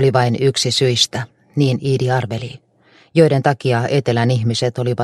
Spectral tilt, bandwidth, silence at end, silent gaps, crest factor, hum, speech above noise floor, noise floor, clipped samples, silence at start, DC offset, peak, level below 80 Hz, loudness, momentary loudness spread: -5 dB/octave; 13 kHz; 0 s; none; 16 dB; none; 36 dB; -52 dBFS; under 0.1%; 0 s; under 0.1%; 0 dBFS; -54 dBFS; -17 LUFS; 10 LU